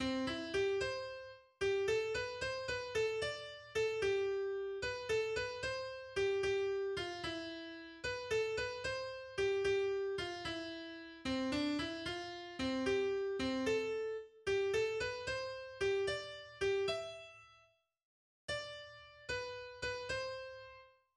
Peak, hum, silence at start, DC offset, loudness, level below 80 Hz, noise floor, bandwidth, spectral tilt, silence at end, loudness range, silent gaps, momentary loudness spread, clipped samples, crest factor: -26 dBFS; none; 0 s; under 0.1%; -39 LUFS; -62 dBFS; -71 dBFS; 11.5 kHz; -4 dB/octave; 0.3 s; 5 LU; 18.03-18.48 s; 12 LU; under 0.1%; 14 dB